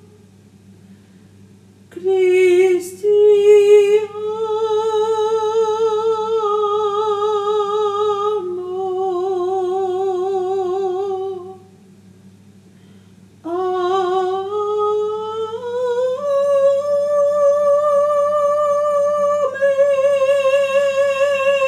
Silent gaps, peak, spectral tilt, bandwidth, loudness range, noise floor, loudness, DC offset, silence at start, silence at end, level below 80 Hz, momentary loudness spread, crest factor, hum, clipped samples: none; -2 dBFS; -4.5 dB/octave; 12.5 kHz; 9 LU; -46 dBFS; -17 LUFS; under 0.1%; 0.9 s; 0 s; -74 dBFS; 10 LU; 16 dB; none; under 0.1%